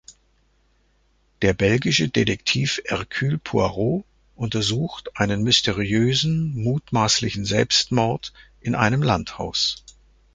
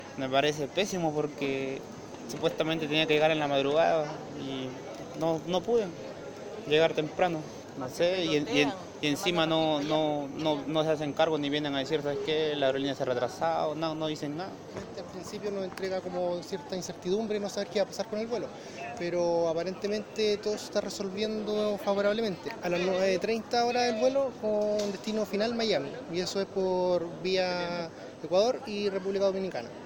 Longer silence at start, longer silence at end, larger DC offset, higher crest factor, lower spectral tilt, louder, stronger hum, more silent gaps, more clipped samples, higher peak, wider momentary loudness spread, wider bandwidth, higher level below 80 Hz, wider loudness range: about the same, 0.1 s vs 0 s; first, 0.55 s vs 0 s; neither; about the same, 20 dB vs 20 dB; about the same, -4.5 dB/octave vs -4.5 dB/octave; first, -21 LUFS vs -30 LUFS; neither; neither; neither; first, -2 dBFS vs -10 dBFS; about the same, 9 LU vs 11 LU; second, 9.6 kHz vs 19 kHz; first, -46 dBFS vs -64 dBFS; about the same, 3 LU vs 5 LU